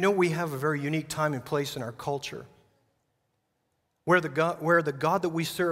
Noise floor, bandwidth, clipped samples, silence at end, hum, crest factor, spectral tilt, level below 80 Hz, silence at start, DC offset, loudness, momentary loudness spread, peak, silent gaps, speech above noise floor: -76 dBFS; 16 kHz; under 0.1%; 0 s; none; 20 dB; -5.5 dB/octave; -66 dBFS; 0 s; under 0.1%; -28 LUFS; 10 LU; -8 dBFS; none; 49 dB